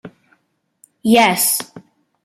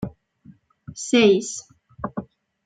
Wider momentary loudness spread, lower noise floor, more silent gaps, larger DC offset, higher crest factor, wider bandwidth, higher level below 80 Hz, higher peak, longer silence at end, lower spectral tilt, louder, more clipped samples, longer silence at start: second, 13 LU vs 19 LU; first, -65 dBFS vs -52 dBFS; neither; neither; about the same, 18 dB vs 20 dB; first, 15.5 kHz vs 9.4 kHz; second, -62 dBFS vs -56 dBFS; about the same, -2 dBFS vs -4 dBFS; about the same, 0.45 s vs 0.4 s; second, -2.5 dB/octave vs -4 dB/octave; first, -15 LUFS vs -21 LUFS; neither; about the same, 0.05 s vs 0 s